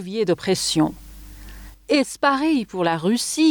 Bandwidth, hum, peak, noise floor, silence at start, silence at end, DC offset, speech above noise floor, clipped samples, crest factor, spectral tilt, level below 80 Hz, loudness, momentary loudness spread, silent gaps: over 20 kHz; none; -6 dBFS; -40 dBFS; 0 s; 0 s; under 0.1%; 20 dB; under 0.1%; 16 dB; -4 dB/octave; -46 dBFS; -21 LUFS; 23 LU; none